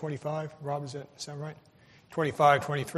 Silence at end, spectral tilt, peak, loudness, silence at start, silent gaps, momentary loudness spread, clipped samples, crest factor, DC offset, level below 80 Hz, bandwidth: 0 s; -5.5 dB/octave; -8 dBFS; -29 LUFS; 0 s; none; 18 LU; under 0.1%; 22 dB; under 0.1%; -68 dBFS; 13.5 kHz